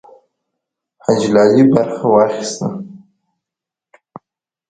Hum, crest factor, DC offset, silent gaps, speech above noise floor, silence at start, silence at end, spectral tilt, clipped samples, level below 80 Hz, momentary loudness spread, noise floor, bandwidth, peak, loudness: none; 16 dB; under 0.1%; none; 73 dB; 1.1 s; 1.75 s; -6 dB/octave; under 0.1%; -58 dBFS; 14 LU; -86 dBFS; 9.4 kHz; 0 dBFS; -14 LUFS